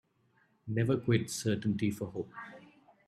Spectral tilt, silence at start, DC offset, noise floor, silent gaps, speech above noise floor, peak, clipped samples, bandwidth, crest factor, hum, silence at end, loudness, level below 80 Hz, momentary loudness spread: -6 dB/octave; 0.65 s; under 0.1%; -71 dBFS; none; 39 dB; -14 dBFS; under 0.1%; 14.5 kHz; 20 dB; none; 0.4 s; -33 LUFS; -68 dBFS; 17 LU